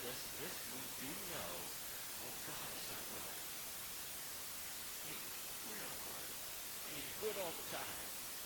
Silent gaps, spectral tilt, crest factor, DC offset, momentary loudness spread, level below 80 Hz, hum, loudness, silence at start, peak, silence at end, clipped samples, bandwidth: none; -1 dB/octave; 16 dB; under 0.1%; 2 LU; -70 dBFS; none; -44 LUFS; 0 s; -30 dBFS; 0 s; under 0.1%; 19 kHz